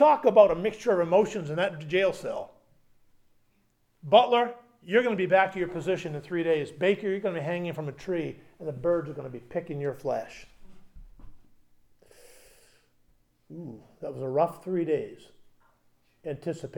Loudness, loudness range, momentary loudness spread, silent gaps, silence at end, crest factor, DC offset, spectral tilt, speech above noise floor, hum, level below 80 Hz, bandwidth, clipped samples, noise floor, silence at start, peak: -27 LUFS; 12 LU; 19 LU; none; 0 s; 22 dB; under 0.1%; -6 dB/octave; 42 dB; none; -60 dBFS; 16 kHz; under 0.1%; -69 dBFS; 0 s; -6 dBFS